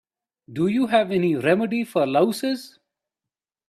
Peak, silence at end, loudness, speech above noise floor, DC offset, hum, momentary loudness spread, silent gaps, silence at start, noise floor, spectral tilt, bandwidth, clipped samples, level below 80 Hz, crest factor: -6 dBFS; 1 s; -22 LUFS; 68 dB; under 0.1%; none; 8 LU; none; 0.5 s; -89 dBFS; -6 dB/octave; 14 kHz; under 0.1%; -66 dBFS; 18 dB